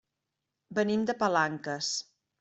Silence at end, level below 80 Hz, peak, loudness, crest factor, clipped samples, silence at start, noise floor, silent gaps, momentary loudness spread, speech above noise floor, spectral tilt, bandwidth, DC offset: 0.4 s; -72 dBFS; -12 dBFS; -30 LUFS; 18 dB; under 0.1%; 0.7 s; -86 dBFS; none; 7 LU; 56 dB; -3.5 dB/octave; 8.2 kHz; under 0.1%